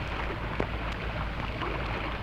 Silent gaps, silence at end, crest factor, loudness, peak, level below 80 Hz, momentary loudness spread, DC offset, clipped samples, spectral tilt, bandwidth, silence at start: none; 0 s; 22 dB; -33 LUFS; -10 dBFS; -38 dBFS; 1 LU; under 0.1%; under 0.1%; -6.5 dB/octave; 9 kHz; 0 s